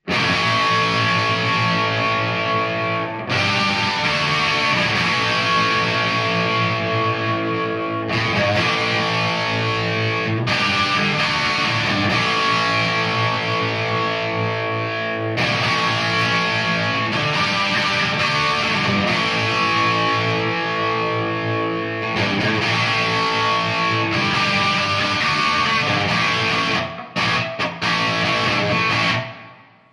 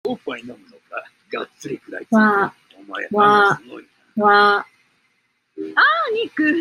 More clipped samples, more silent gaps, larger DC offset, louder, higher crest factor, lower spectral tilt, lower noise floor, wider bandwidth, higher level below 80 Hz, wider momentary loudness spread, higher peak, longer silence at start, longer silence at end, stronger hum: neither; neither; neither; about the same, -18 LUFS vs -17 LUFS; about the same, 16 dB vs 18 dB; about the same, -4.5 dB/octave vs -5.5 dB/octave; second, -44 dBFS vs -67 dBFS; about the same, 11 kHz vs 12 kHz; first, -52 dBFS vs -70 dBFS; second, 5 LU vs 20 LU; about the same, -4 dBFS vs -2 dBFS; about the same, 0.05 s vs 0.05 s; first, 0.4 s vs 0 s; neither